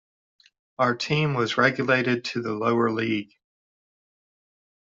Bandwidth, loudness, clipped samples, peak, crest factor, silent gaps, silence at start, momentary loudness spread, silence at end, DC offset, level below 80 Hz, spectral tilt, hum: 7.8 kHz; -24 LUFS; under 0.1%; -6 dBFS; 20 dB; none; 0.8 s; 6 LU; 1.65 s; under 0.1%; -66 dBFS; -6 dB/octave; none